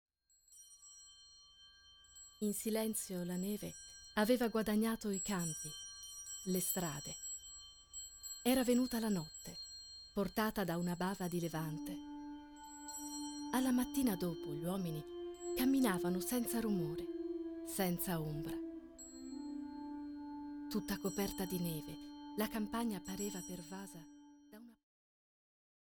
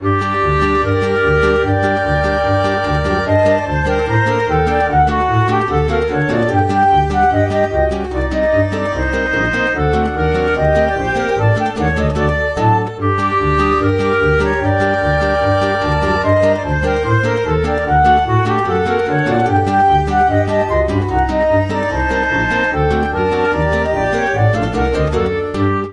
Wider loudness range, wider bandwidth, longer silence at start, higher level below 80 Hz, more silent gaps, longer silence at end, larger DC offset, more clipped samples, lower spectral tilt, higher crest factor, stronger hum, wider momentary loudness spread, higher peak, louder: first, 6 LU vs 1 LU; first, 19 kHz vs 10.5 kHz; first, 0.5 s vs 0 s; second, -64 dBFS vs -28 dBFS; neither; first, 1.1 s vs 0 s; neither; neither; second, -4.5 dB/octave vs -7 dB/octave; first, 20 dB vs 14 dB; neither; first, 19 LU vs 3 LU; second, -20 dBFS vs 0 dBFS; second, -40 LUFS vs -15 LUFS